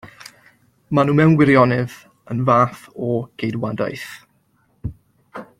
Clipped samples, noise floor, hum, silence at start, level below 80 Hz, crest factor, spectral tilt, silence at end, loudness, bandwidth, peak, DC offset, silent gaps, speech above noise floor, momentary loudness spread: under 0.1%; -62 dBFS; none; 0.05 s; -50 dBFS; 18 dB; -8 dB/octave; 0.15 s; -18 LUFS; 15 kHz; -2 dBFS; under 0.1%; none; 44 dB; 20 LU